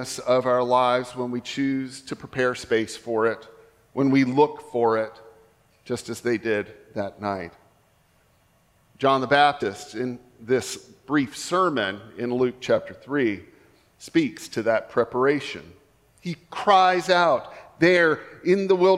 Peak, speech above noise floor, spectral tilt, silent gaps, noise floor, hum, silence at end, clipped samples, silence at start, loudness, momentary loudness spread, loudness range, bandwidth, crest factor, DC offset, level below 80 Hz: -4 dBFS; 39 dB; -5 dB/octave; none; -62 dBFS; none; 0 s; under 0.1%; 0 s; -23 LUFS; 15 LU; 6 LU; 14.5 kHz; 20 dB; under 0.1%; -64 dBFS